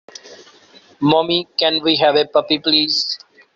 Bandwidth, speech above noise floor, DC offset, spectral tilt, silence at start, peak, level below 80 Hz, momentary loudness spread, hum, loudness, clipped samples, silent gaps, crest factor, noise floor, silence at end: 7.8 kHz; 32 dB; under 0.1%; -4.5 dB/octave; 0.25 s; -2 dBFS; -60 dBFS; 6 LU; none; -16 LUFS; under 0.1%; none; 16 dB; -48 dBFS; 0.4 s